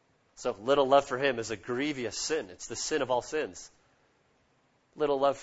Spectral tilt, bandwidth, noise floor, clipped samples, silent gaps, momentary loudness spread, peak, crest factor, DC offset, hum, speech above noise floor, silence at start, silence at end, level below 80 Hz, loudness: -3 dB/octave; 8 kHz; -70 dBFS; under 0.1%; none; 12 LU; -10 dBFS; 22 dB; under 0.1%; none; 40 dB; 0.4 s; 0 s; -62 dBFS; -30 LUFS